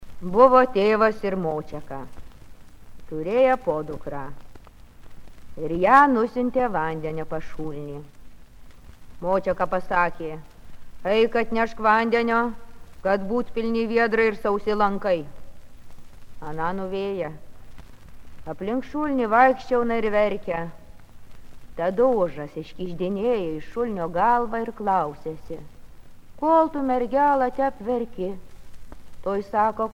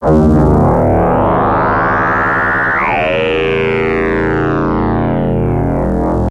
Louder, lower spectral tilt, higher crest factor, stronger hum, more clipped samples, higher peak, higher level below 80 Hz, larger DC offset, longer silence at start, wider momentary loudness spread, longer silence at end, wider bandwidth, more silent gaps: second, -23 LUFS vs -12 LUFS; second, -7 dB/octave vs -8.5 dB/octave; first, 22 dB vs 12 dB; neither; neither; about the same, -2 dBFS vs 0 dBFS; second, -46 dBFS vs -24 dBFS; neither; about the same, 0 s vs 0 s; first, 17 LU vs 5 LU; about the same, 0.05 s vs 0 s; first, 16 kHz vs 9 kHz; neither